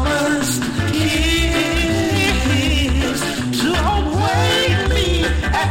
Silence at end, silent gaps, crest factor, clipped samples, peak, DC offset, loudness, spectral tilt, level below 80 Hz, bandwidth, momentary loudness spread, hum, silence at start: 0 s; none; 12 dB; under 0.1%; -4 dBFS; under 0.1%; -17 LUFS; -4.5 dB/octave; -24 dBFS; 17 kHz; 4 LU; none; 0 s